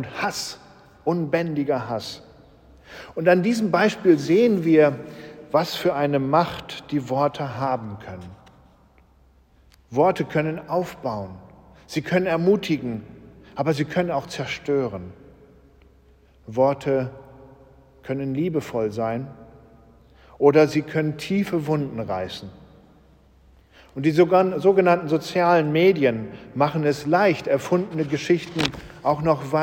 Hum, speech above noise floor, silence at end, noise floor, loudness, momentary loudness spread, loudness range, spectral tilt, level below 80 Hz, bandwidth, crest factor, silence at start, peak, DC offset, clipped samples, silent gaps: none; 35 dB; 0 s; -56 dBFS; -22 LUFS; 16 LU; 8 LU; -6.5 dB/octave; -56 dBFS; 17 kHz; 20 dB; 0 s; -2 dBFS; under 0.1%; under 0.1%; none